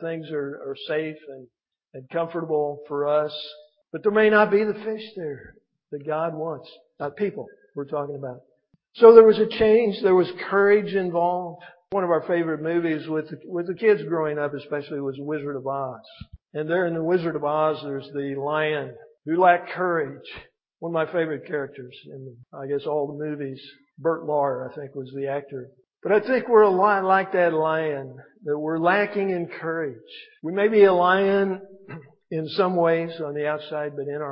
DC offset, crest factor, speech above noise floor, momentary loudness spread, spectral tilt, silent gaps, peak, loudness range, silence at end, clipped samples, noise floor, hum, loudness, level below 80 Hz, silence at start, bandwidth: under 0.1%; 22 dB; 20 dB; 19 LU; -10.5 dB/octave; none; 0 dBFS; 11 LU; 0 s; under 0.1%; -43 dBFS; none; -23 LUFS; -64 dBFS; 0 s; 5.4 kHz